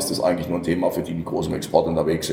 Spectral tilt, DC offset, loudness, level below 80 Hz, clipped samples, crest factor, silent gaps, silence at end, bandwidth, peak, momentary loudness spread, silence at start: -5.5 dB/octave; under 0.1%; -23 LUFS; -46 dBFS; under 0.1%; 20 dB; none; 0 s; 19 kHz; -2 dBFS; 6 LU; 0 s